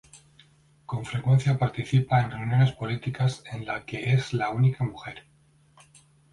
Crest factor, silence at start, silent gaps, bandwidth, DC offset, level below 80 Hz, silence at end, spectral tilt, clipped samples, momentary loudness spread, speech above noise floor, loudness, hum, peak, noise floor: 16 dB; 0.15 s; none; 11 kHz; under 0.1%; -56 dBFS; 1.1 s; -7 dB/octave; under 0.1%; 13 LU; 35 dB; -26 LUFS; none; -10 dBFS; -60 dBFS